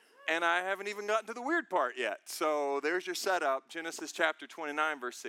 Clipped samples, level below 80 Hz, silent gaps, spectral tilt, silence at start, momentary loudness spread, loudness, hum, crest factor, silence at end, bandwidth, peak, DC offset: under 0.1%; under -90 dBFS; none; -1.5 dB/octave; 0.2 s; 6 LU; -33 LUFS; none; 22 dB; 0 s; 17.5 kHz; -12 dBFS; under 0.1%